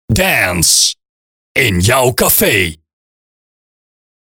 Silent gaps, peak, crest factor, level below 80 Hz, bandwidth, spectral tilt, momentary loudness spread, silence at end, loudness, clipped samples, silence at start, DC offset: 1.09-1.55 s; 0 dBFS; 14 dB; -34 dBFS; over 20 kHz; -2.5 dB/octave; 8 LU; 1.55 s; -11 LUFS; under 0.1%; 0.1 s; under 0.1%